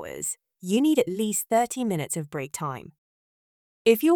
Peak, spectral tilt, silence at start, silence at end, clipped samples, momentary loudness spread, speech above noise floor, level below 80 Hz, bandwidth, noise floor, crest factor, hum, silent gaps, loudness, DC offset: -6 dBFS; -4.5 dB/octave; 0 s; 0 s; under 0.1%; 11 LU; over 66 dB; -68 dBFS; over 20 kHz; under -90 dBFS; 20 dB; none; 2.98-3.85 s; -26 LUFS; under 0.1%